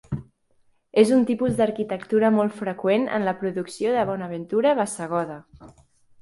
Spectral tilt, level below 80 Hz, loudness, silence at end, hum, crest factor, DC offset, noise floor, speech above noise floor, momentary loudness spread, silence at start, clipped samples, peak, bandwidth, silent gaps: -6 dB/octave; -56 dBFS; -23 LUFS; 0.5 s; none; 18 dB; under 0.1%; -63 dBFS; 40 dB; 11 LU; 0.1 s; under 0.1%; -4 dBFS; 11.5 kHz; none